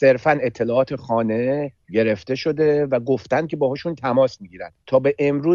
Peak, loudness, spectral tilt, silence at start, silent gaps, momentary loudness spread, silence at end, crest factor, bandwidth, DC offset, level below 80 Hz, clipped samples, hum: -4 dBFS; -21 LUFS; -7.5 dB/octave; 0 s; none; 6 LU; 0 s; 16 dB; 7.2 kHz; under 0.1%; -58 dBFS; under 0.1%; none